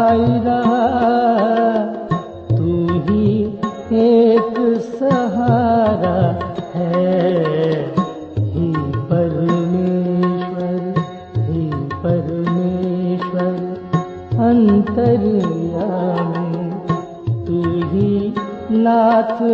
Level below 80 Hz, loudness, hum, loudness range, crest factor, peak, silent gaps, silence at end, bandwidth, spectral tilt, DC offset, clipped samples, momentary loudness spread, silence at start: -44 dBFS; -17 LUFS; none; 4 LU; 14 dB; -2 dBFS; none; 0 s; 7 kHz; -9.5 dB/octave; under 0.1%; under 0.1%; 9 LU; 0 s